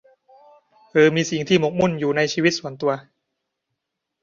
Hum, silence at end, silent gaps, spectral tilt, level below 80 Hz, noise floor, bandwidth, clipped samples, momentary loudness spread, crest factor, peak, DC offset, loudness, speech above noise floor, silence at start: none; 1.2 s; none; -5 dB/octave; -60 dBFS; -80 dBFS; 7.6 kHz; under 0.1%; 8 LU; 18 dB; -4 dBFS; under 0.1%; -20 LUFS; 61 dB; 0.95 s